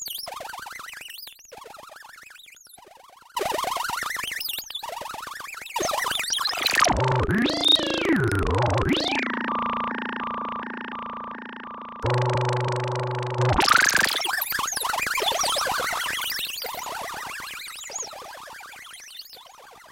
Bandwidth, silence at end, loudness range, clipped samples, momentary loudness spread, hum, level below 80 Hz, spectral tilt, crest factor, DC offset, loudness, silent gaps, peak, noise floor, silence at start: 17 kHz; 0 s; 11 LU; under 0.1%; 20 LU; none; -44 dBFS; -3 dB/octave; 22 dB; under 0.1%; -24 LUFS; none; -4 dBFS; -50 dBFS; 0 s